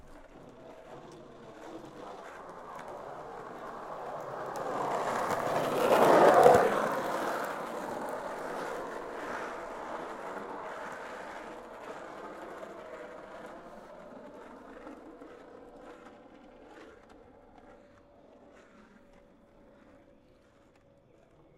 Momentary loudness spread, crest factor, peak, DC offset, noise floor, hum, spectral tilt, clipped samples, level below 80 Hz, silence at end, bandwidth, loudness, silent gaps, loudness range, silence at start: 25 LU; 28 dB; -6 dBFS; under 0.1%; -62 dBFS; none; -4.5 dB/octave; under 0.1%; -66 dBFS; 2.75 s; 16.5 kHz; -30 LUFS; none; 24 LU; 0.05 s